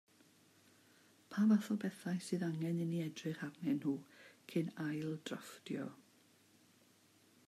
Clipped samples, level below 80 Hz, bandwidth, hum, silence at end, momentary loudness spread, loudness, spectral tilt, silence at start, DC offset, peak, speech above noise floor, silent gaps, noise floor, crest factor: under 0.1%; -88 dBFS; 14.5 kHz; none; 1.5 s; 13 LU; -40 LUFS; -6.5 dB/octave; 1.3 s; under 0.1%; -22 dBFS; 31 dB; none; -69 dBFS; 18 dB